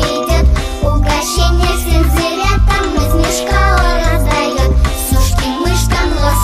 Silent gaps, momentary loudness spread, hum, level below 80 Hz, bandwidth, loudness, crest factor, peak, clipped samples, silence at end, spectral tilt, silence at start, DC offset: none; 2 LU; none; -14 dBFS; 16 kHz; -13 LUFS; 10 dB; 0 dBFS; under 0.1%; 0 s; -4.5 dB/octave; 0 s; 0.2%